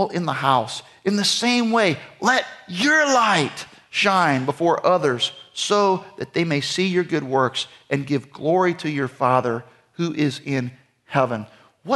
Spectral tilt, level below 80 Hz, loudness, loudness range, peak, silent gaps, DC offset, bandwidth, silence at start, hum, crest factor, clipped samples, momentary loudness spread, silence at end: -4 dB/octave; -68 dBFS; -21 LUFS; 4 LU; -4 dBFS; none; under 0.1%; 12 kHz; 0 s; none; 18 dB; under 0.1%; 10 LU; 0 s